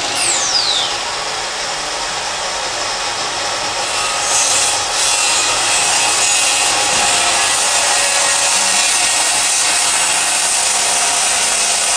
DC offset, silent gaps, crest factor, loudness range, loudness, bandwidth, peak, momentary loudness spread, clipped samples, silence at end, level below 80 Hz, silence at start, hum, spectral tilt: under 0.1%; none; 14 dB; 6 LU; -12 LUFS; 10.5 kHz; 0 dBFS; 8 LU; under 0.1%; 0 s; -48 dBFS; 0 s; none; 1.5 dB/octave